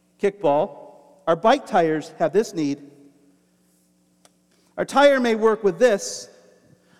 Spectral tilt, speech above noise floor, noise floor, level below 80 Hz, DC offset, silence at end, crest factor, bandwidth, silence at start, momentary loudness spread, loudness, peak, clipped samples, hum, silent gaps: -4.5 dB/octave; 42 dB; -62 dBFS; -64 dBFS; under 0.1%; 0.75 s; 18 dB; 14 kHz; 0.25 s; 14 LU; -21 LUFS; -4 dBFS; under 0.1%; none; none